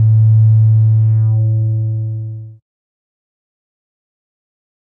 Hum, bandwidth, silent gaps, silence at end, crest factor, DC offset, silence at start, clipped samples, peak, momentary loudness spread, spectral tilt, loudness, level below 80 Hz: none; 1 kHz; none; 2.45 s; 10 dB; under 0.1%; 0 s; under 0.1%; -4 dBFS; 14 LU; -14.5 dB/octave; -12 LUFS; -48 dBFS